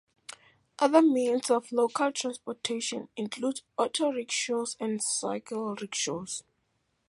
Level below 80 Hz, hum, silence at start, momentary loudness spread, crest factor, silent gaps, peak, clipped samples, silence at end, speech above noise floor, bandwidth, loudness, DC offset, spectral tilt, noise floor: -78 dBFS; none; 0.3 s; 12 LU; 22 dB; none; -8 dBFS; under 0.1%; 0.7 s; 47 dB; 11.5 kHz; -29 LUFS; under 0.1%; -3 dB/octave; -75 dBFS